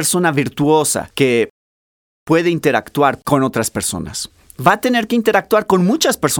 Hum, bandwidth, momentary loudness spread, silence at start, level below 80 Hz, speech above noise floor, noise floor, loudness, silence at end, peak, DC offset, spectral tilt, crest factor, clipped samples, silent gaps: none; over 20 kHz; 7 LU; 0 s; -48 dBFS; over 75 dB; under -90 dBFS; -16 LUFS; 0 s; 0 dBFS; under 0.1%; -4 dB/octave; 16 dB; under 0.1%; 1.50-2.26 s